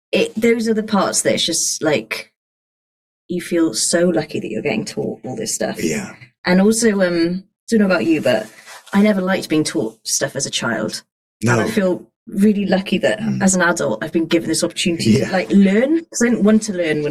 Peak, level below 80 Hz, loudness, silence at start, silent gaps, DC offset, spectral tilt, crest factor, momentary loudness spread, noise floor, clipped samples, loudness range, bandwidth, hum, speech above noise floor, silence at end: -4 dBFS; -52 dBFS; -17 LUFS; 0.15 s; 2.36-3.29 s, 6.38-6.44 s, 7.59-7.67 s, 11.12-11.40 s, 12.16-12.26 s; under 0.1%; -4.5 dB/octave; 14 dB; 10 LU; under -90 dBFS; under 0.1%; 4 LU; 14.5 kHz; none; over 73 dB; 0 s